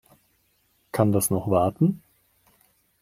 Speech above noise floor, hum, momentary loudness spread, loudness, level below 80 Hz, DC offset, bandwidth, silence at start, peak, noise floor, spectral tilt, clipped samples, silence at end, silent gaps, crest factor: 45 dB; none; 9 LU; -23 LUFS; -58 dBFS; under 0.1%; 16 kHz; 0.95 s; -4 dBFS; -67 dBFS; -6.5 dB/octave; under 0.1%; 1.05 s; none; 22 dB